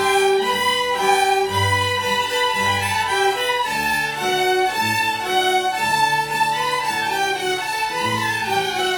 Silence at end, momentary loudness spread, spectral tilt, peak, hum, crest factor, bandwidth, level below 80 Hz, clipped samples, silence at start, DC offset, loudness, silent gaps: 0 s; 3 LU; -2.5 dB/octave; -4 dBFS; none; 14 dB; 19 kHz; -54 dBFS; under 0.1%; 0 s; under 0.1%; -19 LUFS; none